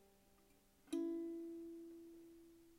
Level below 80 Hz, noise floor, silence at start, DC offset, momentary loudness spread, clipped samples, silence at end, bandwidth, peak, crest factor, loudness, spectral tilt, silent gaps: -80 dBFS; -72 dBFS; 0 s; under 0.1%; 18 LU; under 0.1%; 0 s; 16 kHz; -32 dBFS; 18 dB; -48 LUFS; -5 dB/octave; none